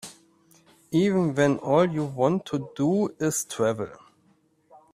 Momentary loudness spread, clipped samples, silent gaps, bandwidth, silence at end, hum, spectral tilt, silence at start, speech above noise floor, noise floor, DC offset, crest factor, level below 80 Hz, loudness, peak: 9 LU; under 0.1%; none; 15.5 kHz; 1 s; none; -6 dB/octave; 0.05 s; 40 dB; -64 dBFS; under 0.1%; 18 dB; -64 dBFS; -25 LUFS; -8 dBFS